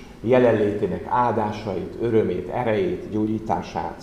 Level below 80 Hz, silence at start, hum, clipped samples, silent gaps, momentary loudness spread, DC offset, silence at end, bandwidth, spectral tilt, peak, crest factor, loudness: -48 dBFS; 0 s; none; under 0.1%; none; 8 LU; 0.1%; 0 s; 11 kHz; -8 dB/octave; -4 dBFS; 18 dB; -23 LUFS